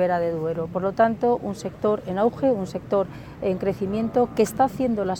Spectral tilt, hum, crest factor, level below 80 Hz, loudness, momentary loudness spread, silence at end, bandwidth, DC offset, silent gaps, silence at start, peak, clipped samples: -7 dB/octave; none; 16 dB; -52 dBFS; -24 LUFS; 6 LU; 0 s; 18.5 kHz; under 0.1%; none; 0 s; -8 dBFS; under 0.1%